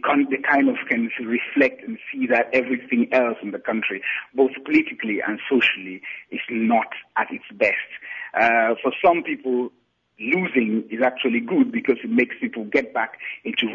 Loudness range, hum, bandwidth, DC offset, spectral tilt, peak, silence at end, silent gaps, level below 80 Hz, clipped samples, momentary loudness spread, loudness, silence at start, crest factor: 2 LU; none; 7.2 kHz; under 0.1%; -6.5 dB/octave; -6 dBFS; 0 s; none; -66 dBFS; under 0.1%; 10 LU; -22 LUFS; 0 s; 16 dB